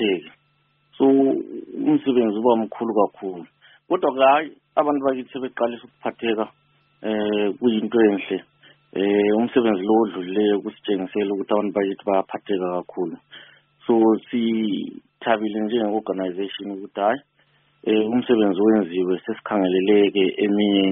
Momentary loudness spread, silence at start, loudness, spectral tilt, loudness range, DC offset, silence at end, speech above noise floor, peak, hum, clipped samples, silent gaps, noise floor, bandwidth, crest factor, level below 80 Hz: 12 LU; 0 s; -21 LUFS; -4.5 dB/octave; 4 LU; under 0.1%; 0 s; 44 dB; -2 dBFS; none; under 0.1%; none; -65 dBFS; 3.8 kHz; 18 dB; -66 dBFS